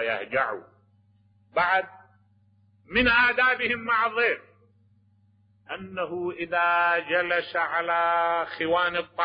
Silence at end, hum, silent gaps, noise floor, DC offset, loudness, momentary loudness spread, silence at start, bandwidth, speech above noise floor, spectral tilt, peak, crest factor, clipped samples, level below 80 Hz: 0 s; none; none; -62 dBFS; under 0.1%; -24 LUFS; 12 LU; 0 s; 5.2 kHz; 37 dB; -8 dB/octave; -10 dBFS; 16 dB; under 0.1%; -54 dBFS